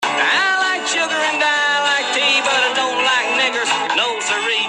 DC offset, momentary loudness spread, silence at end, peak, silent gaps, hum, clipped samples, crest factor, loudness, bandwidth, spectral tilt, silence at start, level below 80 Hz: under 0.1%; 3 LU; 0 s; -4 dBFS; none; none; under 0.1%; 14 dB; -15 LUFS; 13 kHz; 0 dB/octave; 0 s; -68 dBFS